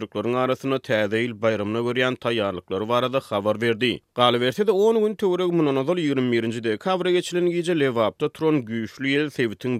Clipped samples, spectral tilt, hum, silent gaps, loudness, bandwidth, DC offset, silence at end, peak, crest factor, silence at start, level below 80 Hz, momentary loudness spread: under 0.1%; -6 dB/octave; none; none; -23 LUFS; 15 kHz; under 0.1%; 0 s; -4 dBFS; 18 dB; 0 s; -66 dBFS; 5 LU